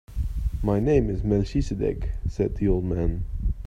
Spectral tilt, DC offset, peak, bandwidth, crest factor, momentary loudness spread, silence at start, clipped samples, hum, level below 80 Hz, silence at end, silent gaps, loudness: -9 dB/octave; under 0.1%; -8 dBFS; 9.6 kHz; 18 dB; 9 LU; 0.1 s; under 0.1%; none; -30 dBFS; 0 s; none; -26 LUFS